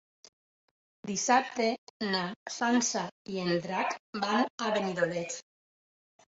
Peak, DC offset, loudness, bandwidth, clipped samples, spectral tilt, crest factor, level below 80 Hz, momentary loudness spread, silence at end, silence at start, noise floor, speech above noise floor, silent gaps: -12 dBFS; under 0.1%; -31 LUFS; 8 kHz; under 0.1%; -3.5 dB/octave; 20 dB; -74 dBFS; 10 LU; 0.9 s; 1.05 s; under -90 dBFS; over 60 dB; 1.78-2.00 s, 2.36-2.46 s, 3.12-3.25 s, 4.00-4.13 s, 4.50-4.58 s